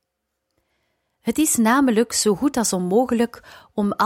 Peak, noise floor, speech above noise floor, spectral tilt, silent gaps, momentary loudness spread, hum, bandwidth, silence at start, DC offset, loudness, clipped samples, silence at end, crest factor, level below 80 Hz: -4 dBFS; -78 dBFS; 58 dB; -4 dB/octave; none; 9 LU; none; 16.5 kHz; 1.25 s; under 0.1%; -20 LUFS; under 0.1%; 0 s; 16 dB; -54 dBFS